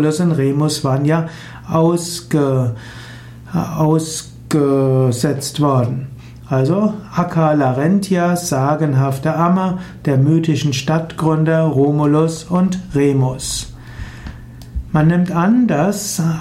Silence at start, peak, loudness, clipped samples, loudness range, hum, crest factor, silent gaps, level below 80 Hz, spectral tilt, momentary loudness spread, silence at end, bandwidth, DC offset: 0 s; -4 dBFS; -16 LUFS; under 0.1%; 3 LU; none; 12 dB; none; -40 dBFS; -6.5 dB/octave; 16 LU; 0 s; 15.5 kHz; under 0.1%